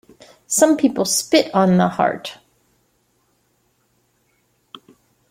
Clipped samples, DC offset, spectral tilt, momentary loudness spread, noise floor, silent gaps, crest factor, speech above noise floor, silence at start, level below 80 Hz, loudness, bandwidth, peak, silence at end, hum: under 0.1%; under 0.1%; -4 dB/octave; 6 LU; -64 dBFS; none; 18 dB; 48 dB; 0.5 s; -62 dBFS; -17 LUFS; 16.5 kHz; -2 dBFS; 2.95 s; none